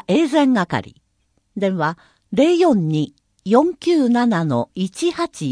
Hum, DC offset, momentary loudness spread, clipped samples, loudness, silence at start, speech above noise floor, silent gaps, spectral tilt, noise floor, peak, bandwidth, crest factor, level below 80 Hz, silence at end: none; under 0.1%; 10 LU; under 0.1%; -18 LUFS; 0.1 s; 48 dB; none; -6.5 dB/octave; -65 dBFS; 0 dBFS; 10.5 kHz; 18 dB; -60 dBFS; 0 s